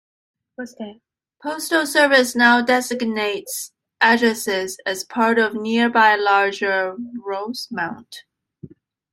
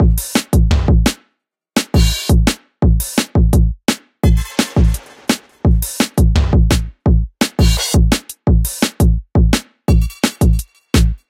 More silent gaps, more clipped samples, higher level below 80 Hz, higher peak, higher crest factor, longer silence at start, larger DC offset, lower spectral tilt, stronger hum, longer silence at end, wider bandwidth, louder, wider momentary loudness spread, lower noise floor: neither; neither; second, -68 dBFS vs -16 dBFS; about the same, -2 dBFS vs 0 dBFS; about the same, 18 dB vs 14 dB; first, 0.6 s vs 0 s; neither; second, -2.5 dB/octave vs -5 dB/octave; neither; first, 0.45 s vs 0.15 s; about the same, 16.5 kHz vs 16.5 kHz; second, -18 LUFS vs -15 LUFS; first, 18 LU vs 5 LU; second, -44 dBFS vs -68 dBFS